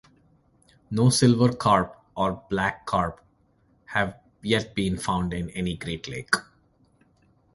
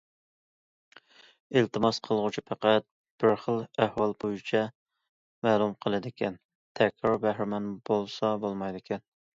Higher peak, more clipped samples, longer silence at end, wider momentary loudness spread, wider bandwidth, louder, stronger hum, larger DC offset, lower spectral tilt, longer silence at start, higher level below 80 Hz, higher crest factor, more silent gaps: first, -4 dBFS vs -8 dBFS; neither; first, 1.1 s vs 0.35 s; first, 13 LU vs 9 LU; first, 11.5 kHz vs 7.8 kHz; first, -25 LUFS vs -29 LUFS; neither; neither; about the same, -5 dB/octave vs -6 dB/octave; second, 0.9 s vs 1.5 s; first, -48 dBFS vs -66 dBFS; about the same, 22 dB vs 22 dB; second, none vs 2.91-3.04 s, 3.11-3.18 s, 4.75-4.86 s, 5.09-5.42 s, 6.45-6.49 s, 6.55-6.75 s